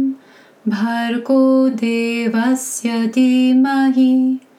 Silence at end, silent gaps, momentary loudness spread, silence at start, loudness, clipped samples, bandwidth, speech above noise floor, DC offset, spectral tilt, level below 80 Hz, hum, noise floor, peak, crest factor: 0.2 s; none; 7 LU; 0 s; -16 LUFS; under 0.1%; 14 kHz; 31 dB; under 0.1%; -4.5 dB/octave; -80 dBFS; none; -46 dBFS; -4 dBFS; 12 dB